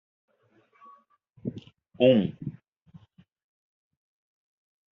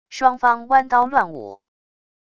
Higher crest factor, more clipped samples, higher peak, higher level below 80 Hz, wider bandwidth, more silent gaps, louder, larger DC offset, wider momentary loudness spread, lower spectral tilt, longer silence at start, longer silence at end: about the same, 24 dB vs 20 dB; neither; second, -8 dBFS vs 0 dBFS; second, -70 dBFS vs -60 dBFS; second, 4 kHz vs 7.6 kHz; neither; second, -25 LUFS vs -18 LUFS; neither; first, 20 LU vs 16 LU; first, -6 dB/octave vs -4 dB/octave; first, 1.45 s vs 0.1 s; first, 2.45 s vs 0.8 s